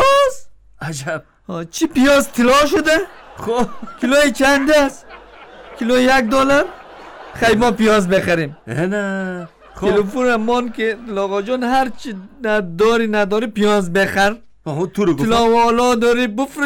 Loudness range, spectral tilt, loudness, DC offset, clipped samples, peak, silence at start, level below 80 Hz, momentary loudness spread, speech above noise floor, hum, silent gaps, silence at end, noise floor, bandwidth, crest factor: 3 LU; -4.5 dB/octave; -16 LUFS; under 0.1%; under 0.1%; -6 dBFS; 0 s; -40 dBFS; 14 LU; 23 dB; none; none; 0 s; -39 dBFS; 19 kHz; 10 dB